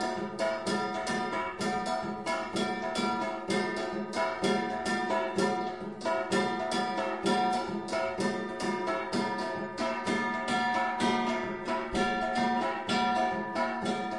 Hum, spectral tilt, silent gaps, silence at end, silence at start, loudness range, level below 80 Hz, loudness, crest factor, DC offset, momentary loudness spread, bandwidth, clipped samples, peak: none; -4.5 dB/octave; none; 0 s; 0 s; 2 LU; -60 dBFS; -31 LUFS; 16 dB; 0.1%; 5 LU; 11.5 kHz; under 0.1%; -16 dBFS